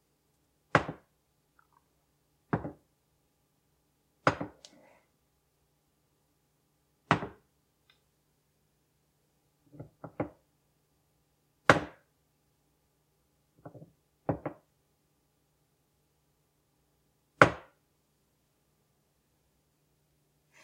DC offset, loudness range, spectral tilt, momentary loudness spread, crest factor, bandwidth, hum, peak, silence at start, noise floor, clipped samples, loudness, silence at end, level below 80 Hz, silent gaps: under 0.1%; 13 LU; -5.5 dB/octave; 26 LU; 38 dB; 16 kHz; none; 0 dBFS; 0.75 s; -74 dBFS; under 0.1%; -30 LUFS; 3.05 s; -64 dBFS; none